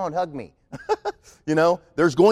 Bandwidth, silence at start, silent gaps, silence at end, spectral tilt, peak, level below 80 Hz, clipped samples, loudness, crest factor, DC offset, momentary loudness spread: 12 kHz; 0 s; none; 0 s; -6 dB/octave; -6 dBFS; -56 dBFS; under 0.1%; -23 LUFS; 16 dB; under 0.1%; 18 LU